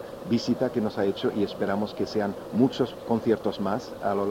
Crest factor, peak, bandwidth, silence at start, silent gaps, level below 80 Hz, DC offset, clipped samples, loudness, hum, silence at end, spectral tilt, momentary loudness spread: 18 dB; -8 dBFS; 16 kHz; 0 s; none; -58 dBFS; under 0.1%; under 0.1%; -27 LUFS; none; 0 s; -6.5 dB/octave; 5 LU